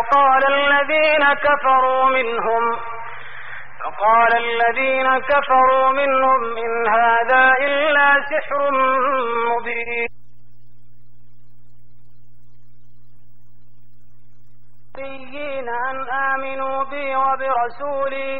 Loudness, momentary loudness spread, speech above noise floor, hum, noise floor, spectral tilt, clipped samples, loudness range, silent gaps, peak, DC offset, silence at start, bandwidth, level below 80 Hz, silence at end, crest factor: -17 LUFS; 16 LU; 38 dB; none; -55 dBFS; -5.5 dB/octave; under 0.1%; 13 LU; none; -6 dBFS; 3%; 0 s; 5.2 kHz; -54 dBFS; 0 s; 14 dB